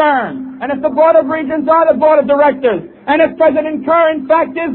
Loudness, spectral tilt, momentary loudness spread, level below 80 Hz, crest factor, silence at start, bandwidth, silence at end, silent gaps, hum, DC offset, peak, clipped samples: -12 LUFS; -9.5 dB/octave; 8 LU; -52 dBFS; 12 dB; 0 s; 4.2 kHz; 0 s; none; none; under 0.1%; 0 dBFS; under 0.1%